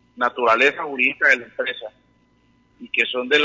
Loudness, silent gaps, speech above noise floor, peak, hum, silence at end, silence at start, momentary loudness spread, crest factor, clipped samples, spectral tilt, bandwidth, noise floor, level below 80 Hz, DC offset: -19 LUFS; none; 40 dB; -4 dBFS; none; 0 s; 0.15 s; 11 LU; 18 dB; under 0.1%; -2.5 dB/octave; 7.8 kHz; -60 dBFS; -66 dBFS; under 0.1%